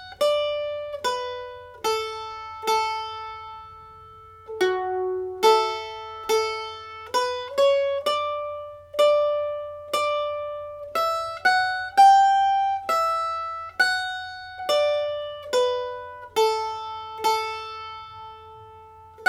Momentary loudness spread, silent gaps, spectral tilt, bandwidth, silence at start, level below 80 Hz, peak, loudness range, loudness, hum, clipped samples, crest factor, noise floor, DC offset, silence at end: 16 LU; none; -2 dB/octave; 16.5 kHz; 0 s; -62 dBFS; -6 dBFS; 8 LU; -24 LUFS; none; under 0.1%; 18 dB; -46 dBFS; under 0.1%; 0 s